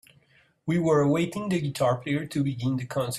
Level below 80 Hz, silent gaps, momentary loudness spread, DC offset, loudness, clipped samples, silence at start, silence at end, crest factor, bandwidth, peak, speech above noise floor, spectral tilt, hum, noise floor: -62 dBFS; none; 7 LU; under 0.1%; -26 LUFS; under 0.1%; 0.65 s; 0 s; 16 dB; 14.5 kHz; -10 dBFS; 37 dB; -6.5 dB/octave; none; -62 dBFS